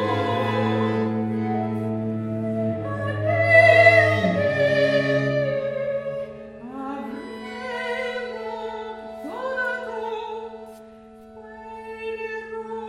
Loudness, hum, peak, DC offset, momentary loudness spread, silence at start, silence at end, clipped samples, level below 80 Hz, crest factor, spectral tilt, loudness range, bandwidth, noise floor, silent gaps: -22 LUFS; none; -2 dBFS; under 0.1%; 19 LU; 0 s; 0 s; under 0.1%; -58 dBFS; 22 dB; -7 dB/octave; 14 LU; 11.5 kHz; -45 dBFS; none